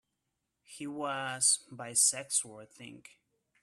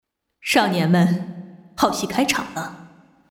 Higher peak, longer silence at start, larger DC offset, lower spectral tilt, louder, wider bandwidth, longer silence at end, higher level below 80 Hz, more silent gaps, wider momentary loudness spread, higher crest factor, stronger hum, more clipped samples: second, -12 dBFS vs -4 dBFS; first, 0.7 s vs 0.45 s; neither; second, -0.5 dB/octave vs -5 dB/octave; second, -29 LUFS vs -20 LUFS; about the same, 15 kHz vs 16.5 kHz; first, 0.65 s vs 0.45 s; second, -82 dBFS vs -56 dBFS; neither; first, 23 LU vs 17 LU; first, 24 dB vs 18 dB; neither; neither